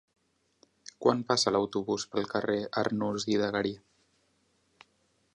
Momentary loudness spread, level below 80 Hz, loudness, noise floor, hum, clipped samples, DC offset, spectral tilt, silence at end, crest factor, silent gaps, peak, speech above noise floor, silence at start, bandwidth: 9 LU; -68 dBFS; -30 LUFS; -72 dBFS; none; under 0.1%; under 0.1%; -4 dB/octave; 1.6 s; 22 dB; none; -10 dBFS; 42 dB; 1 s; 11 kHz